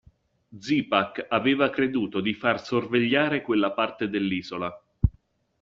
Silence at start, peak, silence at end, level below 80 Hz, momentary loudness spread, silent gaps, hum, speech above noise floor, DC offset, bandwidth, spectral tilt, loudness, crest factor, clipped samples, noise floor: 0.5 s; -4 dBFS; 0.5 s; -44 dBFS; 6 LU; none; none; 37 dB; under 0.1%; 7.4 kHz; -4 dB/octave; -25 LUFS; 22 dB; under 0.1%; -62 dBFS